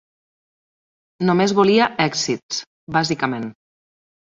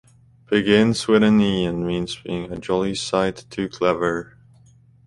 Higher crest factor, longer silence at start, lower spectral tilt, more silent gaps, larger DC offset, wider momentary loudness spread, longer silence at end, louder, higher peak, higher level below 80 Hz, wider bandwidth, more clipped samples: about the same, 18 dB vs 18 dB; first, 1.2 s vs 0.5 s; about the same, -4.5 dB/octave vs -5.5 dB/octave; first, 2.43-2.49 s, 2.67-2.87 s vs none; neither; about the same, 13 LU vs 12 LU; second, 0.7 s vs 0.85 s; about the same, -19 LUFS vs -21 LUFS; about the same, -4 dBFS vs -4 dBFS; second, -60 dBFS vs -48 dBFS; second, 7.8 kHz vs 11.5 kHz; neither